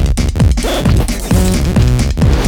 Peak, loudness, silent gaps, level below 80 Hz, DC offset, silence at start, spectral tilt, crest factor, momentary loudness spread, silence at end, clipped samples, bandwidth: -2 dBFS; -13 LUFS; none; -14 dBFS; under 0.1%; 0 s; -6 dB/octave; 10 dB; 2 LU; 0 s; under 0.1%; 18 kHz